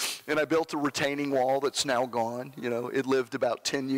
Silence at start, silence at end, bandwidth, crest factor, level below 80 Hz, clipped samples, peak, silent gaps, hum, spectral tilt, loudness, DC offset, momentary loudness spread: 0 s; 0 s; 16 kHz; 12 dB; -70 dBFS; under 0.1%; -16 dBFS; none; none; -3.5 dB/octave; -28 LUFS; under 0.1%; 6 LU